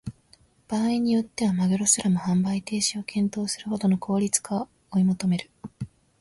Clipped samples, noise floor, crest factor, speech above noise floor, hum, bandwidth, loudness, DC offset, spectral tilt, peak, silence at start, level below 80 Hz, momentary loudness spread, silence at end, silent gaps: under 0.1%; -59 dBFS; 20 dB; 35 dB; none; 11.5 kHz; -25 LUFS; under 0.1%; -4.5 dB/octave; -6 dBFS; 0.05 s; -58 dBFS; 14 LU; 0.35 s; none